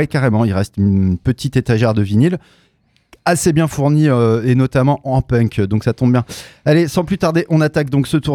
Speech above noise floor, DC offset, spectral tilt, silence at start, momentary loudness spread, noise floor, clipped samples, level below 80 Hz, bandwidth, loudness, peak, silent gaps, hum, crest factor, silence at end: 43 dB; under 0.1%; -7 dB/octave; 0 s; 4 LU; -57 dBFS; under 0.1%; -40 dBFS; 15.5 kHz; -15 LUFS; -2 dBFS; none; none; 14 dB; 0 s